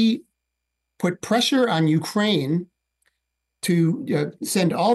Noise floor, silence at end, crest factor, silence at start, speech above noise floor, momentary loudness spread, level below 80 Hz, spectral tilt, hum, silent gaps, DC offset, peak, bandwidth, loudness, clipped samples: -80 dBFS; 0 s; 14 dB; 0 s; 60 dB; 8 LU; -70 dBFS; -5.5 dB/octave; none; none; under 0.1%; -8 dBFS; 12.5 kHz; -22 LUFS; under 0.1%